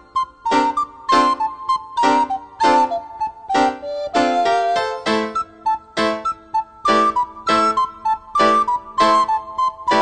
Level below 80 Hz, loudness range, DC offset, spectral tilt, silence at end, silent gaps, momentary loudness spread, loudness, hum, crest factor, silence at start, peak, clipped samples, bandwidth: -54 dBFS; 2 LU; 0.2%; -3.5 dB/octave; 0 s; none; 8 LU; -18 LUFS; none; 16 dB; 0.15 s; -2 dBFS; under 0.1%; 9.4 kHz